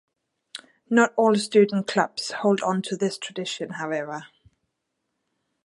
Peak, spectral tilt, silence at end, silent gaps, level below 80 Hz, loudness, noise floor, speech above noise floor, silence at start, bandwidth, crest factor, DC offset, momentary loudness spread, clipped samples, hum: -4 dBFS; -5 dB/octave; 1.4 s; none; -74 dBFS; -23 LUFS; -79 dBFS; 56 dB; 0.55 s; 11.5 kHz; 20 dB; under 0.1%; 19 LU; under 0.1%; none